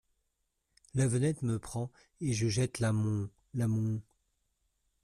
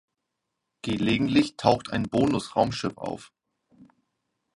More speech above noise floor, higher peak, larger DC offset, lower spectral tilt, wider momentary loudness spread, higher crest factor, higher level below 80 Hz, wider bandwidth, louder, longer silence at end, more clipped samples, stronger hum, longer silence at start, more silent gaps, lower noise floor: second, 49 dB vs 57 dB; second, -18 dBFS vs -4 dBFS; neither; about the same, -6 dB/octave vs -6 dB/octave; second, 9 LU vs 13 LU; second, 16 dB vs 24 dB; second, -60 dBFS vs -54 dBFS; first, 13 kHz vs 11.5 kHz; second, -33 LUFS vs -25 LUFS; first, 1.05 s vs 0.7 s; neither; neither; about the same, 0.95 s vs 0.85 s; neither; about the same, -81 dBFS vs -82 dBFS